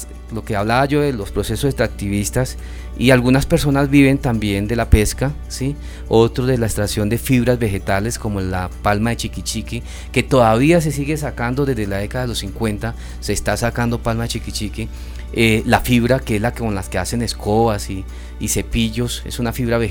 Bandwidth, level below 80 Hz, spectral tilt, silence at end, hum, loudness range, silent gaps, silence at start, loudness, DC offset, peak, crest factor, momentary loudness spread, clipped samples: over 20 kHz; -28 dBFS; -5.5 dB/octave; 0 s; none; 5 LU; none; 0 s; -18 LUFS; under 0.1%; 0 dBFS; 18 dB; 11 LU; under 0.1%